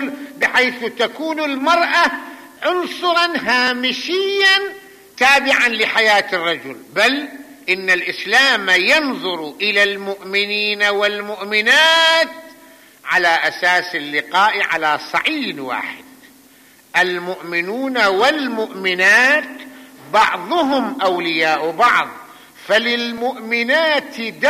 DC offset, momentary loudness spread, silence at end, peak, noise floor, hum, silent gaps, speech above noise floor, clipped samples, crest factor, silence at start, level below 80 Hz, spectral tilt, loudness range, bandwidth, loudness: under 0.1%; 11 LU; 0 s; -4 dBFS; -48 dBFS; none; none; 31 dB; under 0.1%; 14 dB; 0 s; -62 dBFS; -2 dB/octave; 4 LU; 15 kHz; -15 LUFS